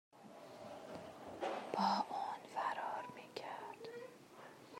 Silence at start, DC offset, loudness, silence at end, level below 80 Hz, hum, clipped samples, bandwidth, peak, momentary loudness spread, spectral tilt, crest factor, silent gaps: 0.15 s; under 0.1%; -44 LUFS; 0 s; -88 dBFS; none; under 0.1%; 16 kHz; -24 dBFS; 20 LU; -4.5 dB/octave; 20 dB; none